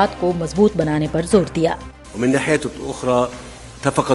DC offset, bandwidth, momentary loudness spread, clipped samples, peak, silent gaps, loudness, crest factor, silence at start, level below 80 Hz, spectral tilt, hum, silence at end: under 0.1%; 11.5 kHz; 11 LU; under 0.1%; 0 dBFS; none; -19 LUFS; 18 dB; 0 s; -40 dBFS; -6 dB/octave; none; 0 s